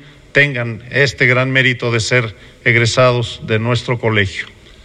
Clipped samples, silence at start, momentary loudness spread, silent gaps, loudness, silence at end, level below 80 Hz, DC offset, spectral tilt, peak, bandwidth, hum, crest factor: under 0.1%; 0 s; 8 LU; none; -14 LUFS; 0.4 s; -46 dBFS; under 0.1%; -5 dB/octave; 0 dBFS; 10 kHz; none; 16 dB